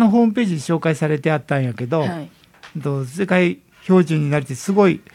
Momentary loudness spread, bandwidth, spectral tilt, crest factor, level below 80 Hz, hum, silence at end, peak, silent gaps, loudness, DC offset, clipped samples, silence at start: 10 LU; 14.5 kHz; -7 dB/octave; 16 dB; -62 dBFS; none; 0.15 s; -2 dBFS; none; -19 LUFS; under 0.1%; under 0.1%; 0 s